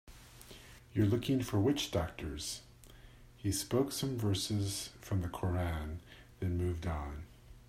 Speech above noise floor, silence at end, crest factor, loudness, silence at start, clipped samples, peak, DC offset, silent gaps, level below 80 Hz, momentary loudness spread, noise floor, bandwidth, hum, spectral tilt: 22 dB; 0.05 s; 18 dB; -36 LUFS; 0.05 s; under 0.1%; -18 dBFS; under 0.1%; none; -52 dBFS; 21 LU; -56 dBFS; 16 kHz; none; -5.5 dB/octave